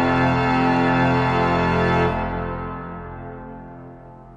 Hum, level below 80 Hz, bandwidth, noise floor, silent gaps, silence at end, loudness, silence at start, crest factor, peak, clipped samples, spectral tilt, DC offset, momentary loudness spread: none; -38 dBFS; 8.6 kHz; -41 dBFS; none; 0 s; -20 LUFS; 0 s; 14 dB; -6 dBFS; under 0.1%; -7.5 dB/octave; under 0.1%; 20 LU